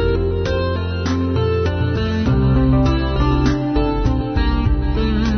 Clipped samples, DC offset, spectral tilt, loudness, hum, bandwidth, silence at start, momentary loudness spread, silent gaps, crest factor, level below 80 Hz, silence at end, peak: under 0.1%; under 0.1%; -8 dB/octave; -18 LUFS; none; 6.4 kHz; 0 s; 4 LU; none; 14 dB; -22 dBFS; 0 s; -4 dBFS